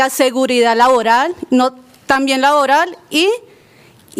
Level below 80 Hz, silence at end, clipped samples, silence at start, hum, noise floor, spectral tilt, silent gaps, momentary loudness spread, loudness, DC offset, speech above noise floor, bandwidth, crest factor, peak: -56 dBFS; 0 s; under 0.1%; 0 s; none; -46 dBFS; -2 dB/octave; none; 6 LU; -13 LUFS; under 0.1%; 33 dB; 16 kHz; 14 dB; 0 dBFS